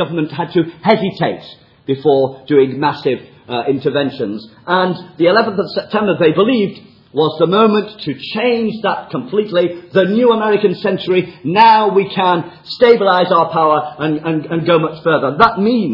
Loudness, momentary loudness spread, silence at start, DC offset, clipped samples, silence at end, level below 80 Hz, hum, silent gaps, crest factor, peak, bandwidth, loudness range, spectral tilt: -14 LUFS; 9 LU; 0 s; under 0.1%; under 0.1%; 0 s; -58 dBFS; none; none; 14 dB; 0 dBFS; 6 kHz; 4 LU; -8.5 dB/octave